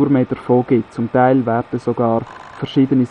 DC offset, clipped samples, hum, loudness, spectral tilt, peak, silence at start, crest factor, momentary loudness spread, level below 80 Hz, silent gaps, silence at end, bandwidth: under 0.1%; under 0.1%; none; -17 LUFS; -9 dB/octave; 0 dBFS; 0 s; 16 dB; 8 LU; -52 dBFS; none; 0.05 s; 8.2 kHz